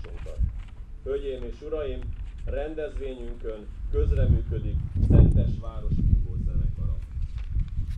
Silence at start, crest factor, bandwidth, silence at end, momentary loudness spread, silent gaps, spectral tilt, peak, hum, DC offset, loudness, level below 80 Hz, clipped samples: 0 s; 20 dB; 4 kHz; 0 s; 16 LU; none; -10 dB/octave; -6 dBFS; none; under 0.1%; -28 LUFS; -28 dBFS; under 0.1%